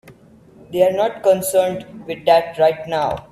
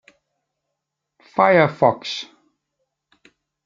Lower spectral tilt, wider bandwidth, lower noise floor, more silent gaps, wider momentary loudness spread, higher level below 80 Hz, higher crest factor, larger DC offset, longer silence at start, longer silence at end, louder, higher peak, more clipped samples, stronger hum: second, -4 dB/octave vs -6 dB/octave; first, 16 kHz vs 7.6 kHz; second, -47 dBFS vs -80 dBFS; neither; second, 10 LU vs 15 LU; first, -54 dBFS vs -64 dBFS; about the same, 18 dB vs 22 dB; neither; second, 0.1 s vs 1.35 s; second, 0.1 s vs 1.4 s; about the same, -18 LUFS vs -18 LUFS; about the same, -2 dBFS vs -2 dBFS; neither; neither